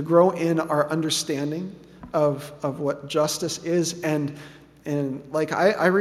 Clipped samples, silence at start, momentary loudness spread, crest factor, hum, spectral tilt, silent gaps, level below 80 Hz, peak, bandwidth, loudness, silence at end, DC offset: under 0.1%; 0 s; 12 LU; 20 dB; none; -5 dB/octave; none; -62 dBFS; -4 dBFS; 15 kHz; -24 LUFS; 0 s; under 0.1%